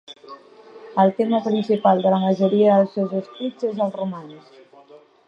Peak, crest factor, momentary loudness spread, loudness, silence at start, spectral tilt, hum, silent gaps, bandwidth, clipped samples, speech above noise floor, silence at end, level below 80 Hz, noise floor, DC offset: -2 dBFS; 18 dB; 13 LU; -20 LUFS; 0.1 s; -8.5 dB/octave; none; none; 6.8 kHz; under 0.1%; 29 dB; 0.3 s; -74 dBFS; -49 dBFS; under 0.1%